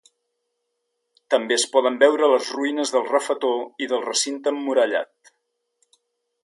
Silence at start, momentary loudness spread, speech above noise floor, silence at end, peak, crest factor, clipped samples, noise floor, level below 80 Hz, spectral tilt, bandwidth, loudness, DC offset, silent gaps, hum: 1.3 s; 8 LU; 56 dB; 1.4 s; -4 dBFS; 20 dB; under 0.1%; -77 dBFS; -82 dBFS; -1 dB/octave; 11.5 kHz; -21 LUFS; under 0.1%; none; none